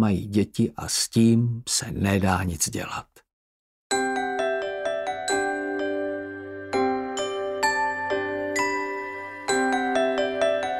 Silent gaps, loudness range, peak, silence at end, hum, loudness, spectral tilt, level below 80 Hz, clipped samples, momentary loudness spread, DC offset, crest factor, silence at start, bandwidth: 3.33-3.90 s; 4 LU; -6 dBFS; 0 s; none; -25 LUFS; -4.5 dB/octave; -54 dBFS; under 0.1%; 8 LU; under 0.1%; 20 dB; 0 s; 16 kHz